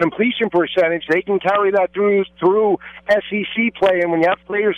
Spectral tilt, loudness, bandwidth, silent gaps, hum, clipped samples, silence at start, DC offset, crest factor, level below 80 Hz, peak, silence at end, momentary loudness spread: -7 dB/octave; -17 LUFS; 7.2 kHz; none; none; under 0.1%; 0 s; under 0.1%; 12 dB; -56 dBFS; -6 dBFS; 0 s; 3 LU